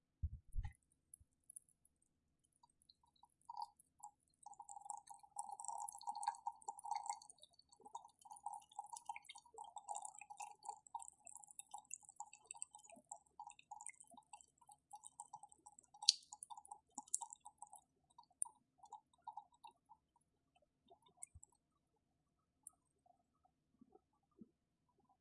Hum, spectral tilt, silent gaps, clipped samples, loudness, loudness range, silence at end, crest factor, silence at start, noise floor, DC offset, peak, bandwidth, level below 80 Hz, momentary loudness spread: none; -0.5 dB/octave; none; under 0.1%; -49 LUFS; 21 LU; 0.75 s; 42 dB; 0.25 s; -87 dBFS; under 0.1%; -10 dBFS; 11.5 kHz; -66 dBFS; 18 LU